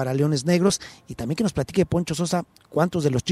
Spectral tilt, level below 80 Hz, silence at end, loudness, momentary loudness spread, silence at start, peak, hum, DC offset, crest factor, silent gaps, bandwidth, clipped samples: -5.5 dB/octave; -48 dBFS; 0 s; -23 LUFS; 9 LU; 0 s; -6 dBFS; none; under 0.1%; 16 dB; none; 13 kHz; under 0.1%